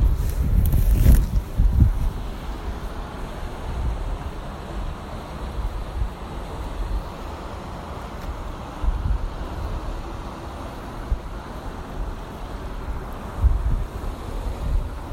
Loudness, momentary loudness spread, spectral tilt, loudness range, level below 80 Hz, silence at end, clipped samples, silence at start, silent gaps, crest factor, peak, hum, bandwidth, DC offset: -28 LUFS; 13 LU; -7 dB/octave; 10 LU; -24 dBFS; 0 s; under 0.1%; 0 s; none; 22 dB; -2 dBFS; none; 16.5 kHz; under 0.1%